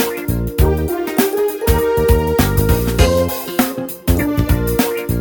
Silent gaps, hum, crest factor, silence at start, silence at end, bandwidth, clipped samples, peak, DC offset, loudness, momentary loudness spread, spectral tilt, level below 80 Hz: none; none; 16 dB; 0 s; 0 s; 19.5 kHz; under 0.1%; 0 dBFS; under 0.1%; -16 LUFS; 4 LU; -6 dB/octave; -22 dBFS